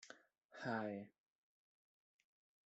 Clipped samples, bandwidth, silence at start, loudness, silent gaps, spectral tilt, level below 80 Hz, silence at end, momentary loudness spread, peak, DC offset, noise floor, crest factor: under 0.1%; 8 kHz; 0 s; -47 LUFS; 0.45-0.49 s; -4.5 dB/octave; under -90 dBFS; 1.6 s; 19 LU; -30 dBFS; under 0.1%; -65 dBFS; 22 dB